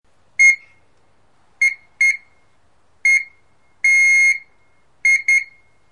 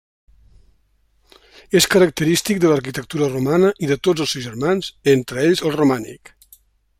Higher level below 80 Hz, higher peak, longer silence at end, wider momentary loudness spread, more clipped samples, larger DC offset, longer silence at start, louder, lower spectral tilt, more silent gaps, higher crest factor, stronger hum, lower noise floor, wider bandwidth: second, -66 dBFS vs -52 dBFS; second, -6 dBFS vs 0 dBFS; second, 0.5 s vs 0.85 s; first, 13 LU vs 7 LU; neither; first, 0.3% vs under 0.1%; second, 0.4 s vs 1.7 s; first, -14 LUFS vs -18 LUFS; second, 3.5 dB/octave vs -4.5 dB/octave; neither; about the same, 14 dB vs 18 dB; neither; about the same, -61 dBFS vs -61 dBFS; second, 11.5 kHz vs 16 kHz